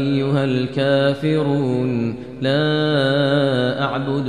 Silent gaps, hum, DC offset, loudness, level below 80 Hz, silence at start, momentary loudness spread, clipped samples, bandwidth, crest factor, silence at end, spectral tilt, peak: none; none; 0.4%; -19 LUFS; -54 dBFS; 0 s; 5 LU; under 0.1%; 10 kHz; 14 dB; 0 s; -7.5 dB/octave; -4 dBFS